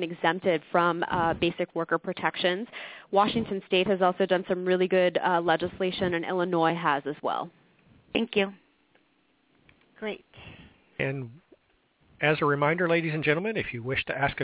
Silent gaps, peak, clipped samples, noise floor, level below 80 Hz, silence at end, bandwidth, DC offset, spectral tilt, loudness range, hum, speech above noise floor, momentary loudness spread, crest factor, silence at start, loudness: none; -8 dBFS; under 0.1%; -68 dBFS; -58 dBFS; 0 s; 4 kHz; under 0.1%; -9.5 dB/octave; 9 LU; none; 41 dB; 11 LU; 20 dB; 0 s; -27 LUFS